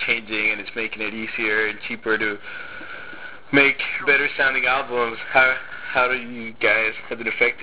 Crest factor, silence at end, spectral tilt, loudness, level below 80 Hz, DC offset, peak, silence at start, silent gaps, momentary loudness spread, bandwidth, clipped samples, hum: 20 dB; 0 s; -7 dB/octave; -20 LUFS; -56 dBFS; 1%; -2 dBFS; 0 s; none; 17 LU; 4 kHz; under 0.1%; none